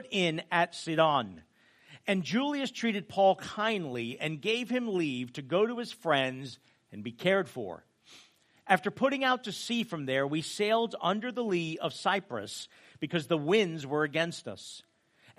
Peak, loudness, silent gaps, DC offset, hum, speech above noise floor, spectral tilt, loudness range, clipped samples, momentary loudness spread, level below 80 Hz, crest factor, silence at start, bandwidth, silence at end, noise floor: -8 dBFS; -30 LUFS; none; under 0.1%; none; 32 dB; -5 dB/octave; 2 LU; under 0.1%; 15 LU; -78 dBFS; 24 dB; 0 s; 15 kHz; 0.6 s; -63 dBFS